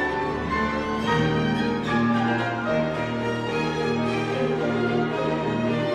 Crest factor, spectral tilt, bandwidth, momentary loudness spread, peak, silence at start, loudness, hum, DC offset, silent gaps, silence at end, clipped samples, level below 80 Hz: 14 dB; -6.5 dB/octave; 10.5 kHz; 4 LU; -10 dBFS; 0 s; -24 LUFS; none; under 0.1%; none; 0 s; under 0.1%; -46 dBFS